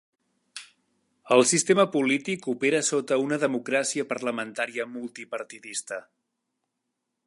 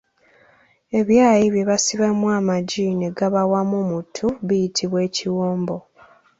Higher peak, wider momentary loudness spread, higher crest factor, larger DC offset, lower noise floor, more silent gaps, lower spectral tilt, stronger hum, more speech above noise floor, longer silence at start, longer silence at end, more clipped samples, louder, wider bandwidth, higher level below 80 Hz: about the same, -6 dBFS vs -4 dBFS; first, 17 LU vs 10 LU; first, 22 dB vs 16 dB; neither; first, -81 dBFS vs -56 dBFS; neither; second, -3 dB/octave vs -5 dB/octave; neither; first, 56 dB vs 37 dB; second, 0.55 s vs 0.9 s; first, 1.25 s vs 0.6 s; neither; second, -25 LUFS vs -20 LUFS; first, 11.5 kHz vs 8 kHz; second, -78 dBFS vs -56 dBFS